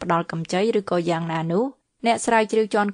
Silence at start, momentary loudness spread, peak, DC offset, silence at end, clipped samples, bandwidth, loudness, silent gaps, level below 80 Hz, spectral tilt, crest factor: 0 s; 6 LU; -6 dBFS; under 0.1%; 0 s; under 0.1%; 10.5 kHz; -22 LUFS; none; -62 dBFS; -5.5 dB/octave; 16 dB